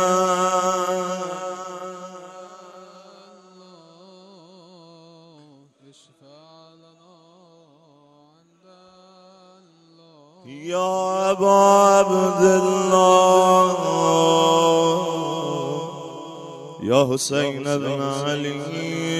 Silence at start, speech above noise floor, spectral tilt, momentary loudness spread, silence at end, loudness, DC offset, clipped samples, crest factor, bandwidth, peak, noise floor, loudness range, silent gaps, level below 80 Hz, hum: 0 s; 38 dB; -4.5 dB/octave; 21 LU; 0 s; -19 LUFS; under 0.1%; under 0.1%; 20 dB; 14 kHz; -2 dBFS; -56 dBFS; 17 LU; none; -66 dBFS; none